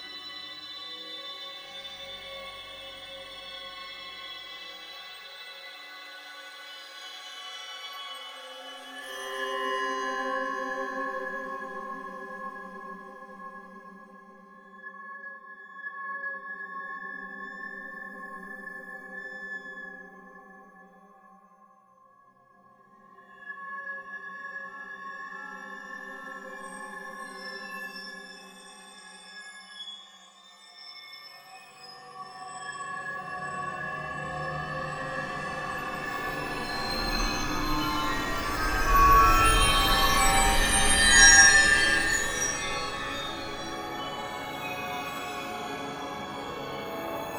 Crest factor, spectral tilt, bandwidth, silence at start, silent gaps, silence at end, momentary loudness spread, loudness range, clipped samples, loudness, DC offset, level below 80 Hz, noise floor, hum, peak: 28 dB; -1.5 dB/octave; over 20 kHz; 0 s; none; 0 s; 22 LU; 23 LU; under 0.1%; -26 LUFS; under 0.1%; -40 dBFS; -59 dBFS; none; -2 dBFS